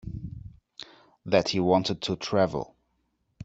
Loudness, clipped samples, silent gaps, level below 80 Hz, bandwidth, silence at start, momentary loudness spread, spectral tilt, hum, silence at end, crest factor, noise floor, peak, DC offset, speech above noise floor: -26 LUFS; under 0.1%; none; -54 dBFS; 8 kHz; 0.05 s; 22 LU; -5.5 dB/octave; none; 0 s; 22 dB; -74 dBFS; -8 dBFS; under 0.1%; 49 dB